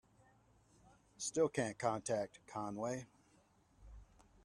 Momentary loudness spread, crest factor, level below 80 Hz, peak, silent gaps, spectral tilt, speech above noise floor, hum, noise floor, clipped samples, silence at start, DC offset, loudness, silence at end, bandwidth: 20 LU; 22 dB; -68 dBFS; -20 dBFS; none; -4.5 dB/octave; 32 dB; none; -71 dBFS; under 0.1%; 1.2 s; under 0.1%; -40 LUFS; 0.4 s; 12 kHz